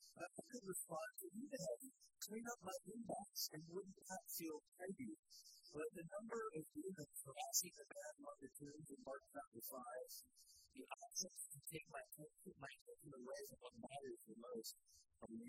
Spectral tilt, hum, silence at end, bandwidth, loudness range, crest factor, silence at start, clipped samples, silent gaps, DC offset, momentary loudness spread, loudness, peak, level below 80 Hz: -2.5 dB/octave; none; 0 s; 16 kHz; 7 LU; 28 dB; 0 s; under 0.1%; 4.68-4.72 s, 5.19-5.23 s, 9.47-9.52 s, 12.81-12.86 s; under 0.1%; 11 LU; -52 LUFS; -26 dBFS; -86 dBFS